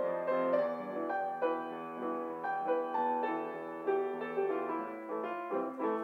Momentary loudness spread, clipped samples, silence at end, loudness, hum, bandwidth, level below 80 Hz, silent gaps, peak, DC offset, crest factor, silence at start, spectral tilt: 6 LU; under 0.1%; 0 s; -35 LUFS; none; 5.8 kHz; under -90 dBFS; none; -20 dBFS; under 0.1%; 16 dB; 0 s; -7 dB/octave